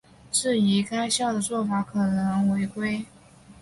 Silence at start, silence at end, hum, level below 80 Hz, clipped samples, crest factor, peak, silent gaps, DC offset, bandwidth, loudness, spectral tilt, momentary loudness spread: 0.3 s; 0 s; none; -58 dBFS; under 0.1%; 14 dB; -10 dBFS; none; under 0.1%; 11.5 kHz; -25 LUFS; -4.5 dB/octave; 7 LU